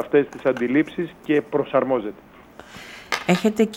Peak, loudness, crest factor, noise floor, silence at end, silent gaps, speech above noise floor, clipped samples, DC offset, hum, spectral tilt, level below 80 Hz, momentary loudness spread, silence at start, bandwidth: -4 dBFS; -22 LUFS; 18 dB; -44 dBFS; 0 s; none; 23 dB; under 0.1%; under 0.1%; none; -6 dB/octave; -58 dBFS; 19 LU; 0 s; 16.5 kHz